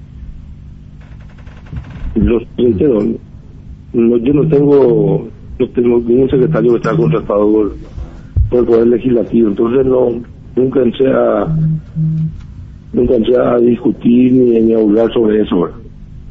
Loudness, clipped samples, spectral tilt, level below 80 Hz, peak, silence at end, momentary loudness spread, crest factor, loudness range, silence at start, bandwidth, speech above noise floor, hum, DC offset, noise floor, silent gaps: -12 LUFS; under 0.1%; -10 dB/octave; -30 dBFS; -2 dBFS; 0 s; 16 LU; 12 dB; 4 LU; 0 s; 5.8 kHz; 22 dB; none; under 0.1%; -33 dBFS; none